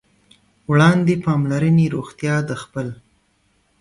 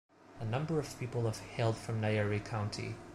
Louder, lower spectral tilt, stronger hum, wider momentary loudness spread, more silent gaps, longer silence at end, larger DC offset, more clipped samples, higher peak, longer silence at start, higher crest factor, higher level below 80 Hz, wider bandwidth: first, -18 LUFS vs -36 LUFS; first, -7.5 dB/octave vs -6 dB/octave; neither; first, 14 LU vs 6 LU; neither; first, 0.85 s vs 0 s; neither; neither; first, -2 dBFS vs -20 dBFS; first, 0.7 s vs 0.3 s; about the same, 16 dB vs 16 dB; first, -52 dBFS vs -60 dBFS; second, 11.5 kHz vs 13 kHz